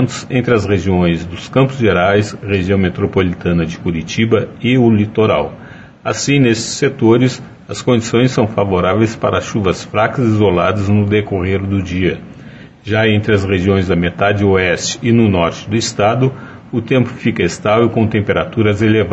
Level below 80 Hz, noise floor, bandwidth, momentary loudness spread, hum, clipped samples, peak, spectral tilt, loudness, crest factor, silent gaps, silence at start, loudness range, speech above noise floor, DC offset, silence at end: -40 dBFS; -35 dBFS; 8.4 kHz; 6 LU; none; under 0.1%; 0 dBFS; -6 dB/octave; -14 LUFS; 14 dB; none; 0 s; 2 LU; 22 dB; under 0.1%; 0 s